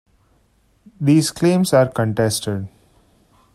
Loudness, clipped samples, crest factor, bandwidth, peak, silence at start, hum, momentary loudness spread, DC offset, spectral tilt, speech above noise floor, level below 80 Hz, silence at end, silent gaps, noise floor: -18 LUFS; under 0.1%; 18 dB; 16 kHz; -2 dBFS; 1 s; none; 11 LU; under 0.1%; -5.5 dB/octave; 42 dB; -54 dBFS; 0.85 s; none; -59 dBFS